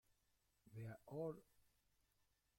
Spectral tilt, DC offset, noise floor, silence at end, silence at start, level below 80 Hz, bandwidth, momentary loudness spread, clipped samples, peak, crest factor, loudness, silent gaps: -8.5 dB/octave; under 0.1%; -84 dBFS; 1.15 s; 0.65 s; -84 dBFS; 16.5 kHz; 11 LU; under 0.1%; -38 dBFS; 20 dB; -54 LUFS; none